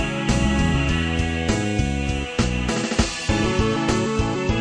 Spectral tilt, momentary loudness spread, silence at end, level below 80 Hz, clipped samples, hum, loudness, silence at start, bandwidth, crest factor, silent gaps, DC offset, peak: -5 dB/octave; 3 LU; 0 s; -28 dBFS; under 0.1%; none; -22 LUFS; 0 s; 10.5 kHz; 16 dB; none; under 0.1%; -6 dBFS